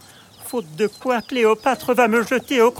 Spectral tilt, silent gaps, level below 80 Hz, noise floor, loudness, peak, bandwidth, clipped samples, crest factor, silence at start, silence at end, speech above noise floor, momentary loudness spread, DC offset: -4 dB/octave; none; -64 dBFS; -41 dBFS; -20 LUFS; -4 dBFS; 17.5 kHz; under 0.1%; 14 dB; 0.4 s; 0 s; 22 dB; 12 LU; under 0.1%